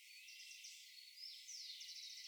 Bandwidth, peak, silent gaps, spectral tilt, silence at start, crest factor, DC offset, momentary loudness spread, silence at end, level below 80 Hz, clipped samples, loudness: over 20 kHz; -40 dBFS; none; 8.5 dB/octave; 0 s; 16 dB; under 0.1%; 6 LU; 0 s; under -90 dBFS; under 0.1%; -53 LUFS